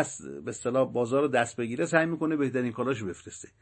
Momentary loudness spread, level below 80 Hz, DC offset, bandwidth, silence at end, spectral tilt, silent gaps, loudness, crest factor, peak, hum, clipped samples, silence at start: 12 LU; -66 dBFS; under 0.1%; 8.8 kHz; 0.15 s; -5.5 dB/octave; none; -28 LUFS; 22 dB; -8 dBFS; none; under 0.1%; 0 s